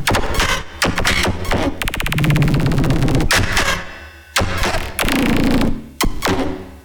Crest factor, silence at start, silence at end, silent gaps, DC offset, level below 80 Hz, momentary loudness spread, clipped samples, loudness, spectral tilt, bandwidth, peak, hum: 12 dB; 0 s; 0.05 s; none; under 0.1%; -24 dBFS; 7 LU; under 0.1%; -18 LUFS; -4.5 dB/octave; over 20 kHz; -4 dBFS; none